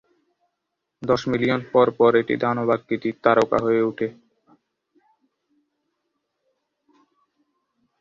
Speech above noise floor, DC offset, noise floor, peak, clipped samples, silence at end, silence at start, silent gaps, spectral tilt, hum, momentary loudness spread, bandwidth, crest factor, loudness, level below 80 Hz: 60 dB; under 0.1%; -80 dBFS; -2 dBFS; under 0.1%; 3.9 s; 1 s; none; -7 dB/octave; none; 9 LU; 7.4 kHz; 22 dB; -21 LUFS; -60 dBFS